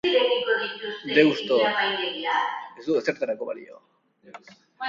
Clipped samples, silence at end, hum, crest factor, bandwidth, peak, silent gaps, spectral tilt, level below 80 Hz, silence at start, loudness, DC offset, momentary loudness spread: under 0.1%; 0 s; none; 22 dB; 7.4 kHz; -4 dBFS; none; -4.5 dB/octave; -72 dBFS; 0.05 s; -24 LUFS; under 0.1%; 13 LU